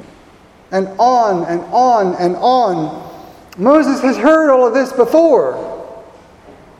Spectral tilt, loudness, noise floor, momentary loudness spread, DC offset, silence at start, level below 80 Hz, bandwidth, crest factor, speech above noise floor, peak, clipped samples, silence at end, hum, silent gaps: -6 dB/octave; -13 LUFS; -44 dBFS; 15 LU; under 0.1%; 0 s; -54 dBFS; 14 kHz; 14 dB; 32 dB; 0 dBFS; under 0.1%; 0.3 s; none; none